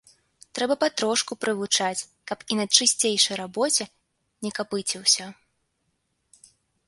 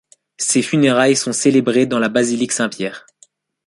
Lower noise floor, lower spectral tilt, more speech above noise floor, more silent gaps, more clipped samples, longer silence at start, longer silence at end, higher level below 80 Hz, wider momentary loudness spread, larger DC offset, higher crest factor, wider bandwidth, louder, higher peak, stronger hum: first, -74 dBFS vs -53 dBFS; second, -1 dB/octave vs -4 dB/octave; first, 49 dB vs 38 dB; neither; neither; first, 0.55 s vs 0.4 s; first, 1.55 s vs 0.65 s; second, -72 dBFS vs -62 dBFS; first, 16 LU vs 8 LU; neither; first, 26 dB vs 16 dB; about the same, 12 kHz vs 11.5 kHz; second, -23 LUFS vs -16 LUFS; about the same, -2 dBFS vs -2 dBFS; neither